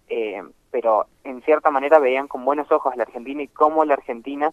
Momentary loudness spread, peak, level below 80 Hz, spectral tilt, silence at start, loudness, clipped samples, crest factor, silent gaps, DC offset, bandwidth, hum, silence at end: 14 LU; -2 dBFS; -64 dBFS; -5.5 dB/octave; 0.1 s; -20 LUFS; under 0.1%; 20 dB; none; under 0.1%; 7.8 kHz; none; 0 s